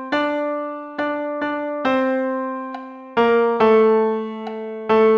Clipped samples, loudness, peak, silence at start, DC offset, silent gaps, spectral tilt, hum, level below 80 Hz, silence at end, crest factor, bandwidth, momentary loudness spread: under 0.1%; -20 LUFS; -4 dBFS; 0 s; under 0.1%; none; -6.5 dB/octave; none; -62 dBFS; 0 s; 14 dB; 6.2 kHz; 14 LU